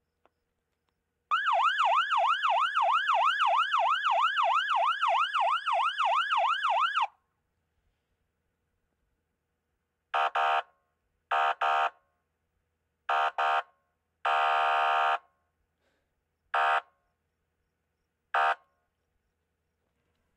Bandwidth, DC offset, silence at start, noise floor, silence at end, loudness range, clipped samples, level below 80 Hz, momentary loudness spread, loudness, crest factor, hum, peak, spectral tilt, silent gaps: 11 kHz; under 0.1%; 1.3 s; -81 dBFS; 1.8 s; 9 LU; under 0.1%; -86 dBFS; 7 LU; -27 LUFS; 14 dB; none; -16 dBFS; 1.5 dB/octave; none